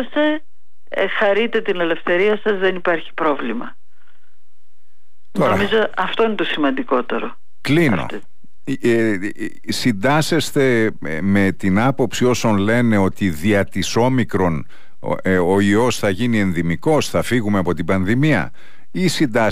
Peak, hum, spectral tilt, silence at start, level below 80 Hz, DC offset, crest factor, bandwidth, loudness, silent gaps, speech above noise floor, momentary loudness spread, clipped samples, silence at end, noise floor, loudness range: -6 dBFS; none; -5.5 dB/octave; 0 s; -48 dBFS; 5%; 12 dB; 15.5 kHz; -18 LUFS; none; 50 dB; 10 LU; under 0.1%; 0 s; -67 dBFS; 4 LU